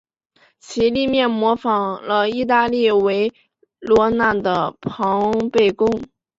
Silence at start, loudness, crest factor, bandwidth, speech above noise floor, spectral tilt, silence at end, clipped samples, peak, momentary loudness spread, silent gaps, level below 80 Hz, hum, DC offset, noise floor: 0.7 s; -18 LUFS; 16 dB; 7.8 kHz; 41 dB; -5.5 dB/octave; 0.35 s; under 0.1%; -2 dBFS; 7 LU; none; -50 dBFS; none; under 0.1%; -58 dBFS